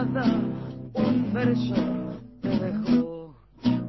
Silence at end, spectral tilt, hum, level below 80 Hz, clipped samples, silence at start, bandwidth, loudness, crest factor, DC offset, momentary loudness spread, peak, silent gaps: 0 s; -8.5 dB/octave; none; -52 dBFS; under 0.1%; 0 s; 6 kHz; -26 LUFS; 16 dB; under 0.1%; 10 LU; -10 dBFS; none